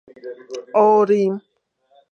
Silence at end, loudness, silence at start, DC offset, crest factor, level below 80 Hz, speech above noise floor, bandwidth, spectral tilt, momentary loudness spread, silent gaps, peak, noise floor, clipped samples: 0.75 s; -17 LUFS; 0.25 s; under 0.1%; 16 dB; -76 dBFS; 43 dB; 7 kHz; -7.5 dB/octave; 22 LU; none; -4 dBFS; -60 dBFS; under 0.1%